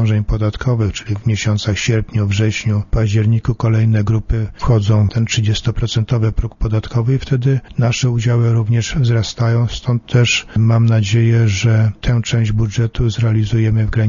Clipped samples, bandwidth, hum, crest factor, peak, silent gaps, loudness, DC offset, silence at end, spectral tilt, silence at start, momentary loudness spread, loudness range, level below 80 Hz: under 0.1%; 7.4 kHz; none; 14 dB; 0 dBFS; none; -16 LUFS; under 0.1%; 0 s; -6 dB/octave; 0 s; 5 LU; 2 LU; -28 dBFS